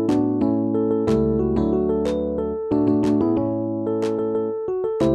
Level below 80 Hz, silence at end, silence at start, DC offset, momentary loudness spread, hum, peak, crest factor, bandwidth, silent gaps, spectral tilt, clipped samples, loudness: -40 dBFS; 0 s; 0 s; under 0.1%; 5 LU; none; -8 dBFS; 12 dB; 10 kHz; none; -9 dB/octave; under 0.1%; -21 LUFS